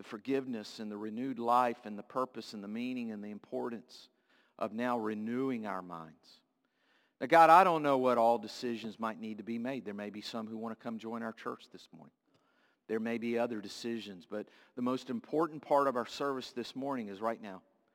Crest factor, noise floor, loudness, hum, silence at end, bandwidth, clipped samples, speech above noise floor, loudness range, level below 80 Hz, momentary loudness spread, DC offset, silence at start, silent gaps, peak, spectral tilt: 24 dB; -76 dBFS; -34 LUFS; none; 0.35 s; 16.5 kHz; under 0.1%; 42 dB; 12 LU; -86 dBFS; 16 LU; under 0.1%; 0 s; none; -10 dBFS; -5.5 dB/octave